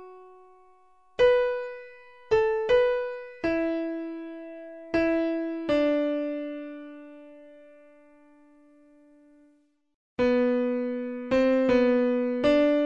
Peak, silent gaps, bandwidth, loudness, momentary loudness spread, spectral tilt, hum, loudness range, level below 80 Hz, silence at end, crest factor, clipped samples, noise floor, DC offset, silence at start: -10 dBFS; 9.94-10.17 s; 7.4 kHz; -25 LUFS; 19 LU; -6 dB/octave; none; 9 LU; -56 dBFS; 0 s; 16 dB; under 0.1%; -65 dBFS; 0.1%; 0 s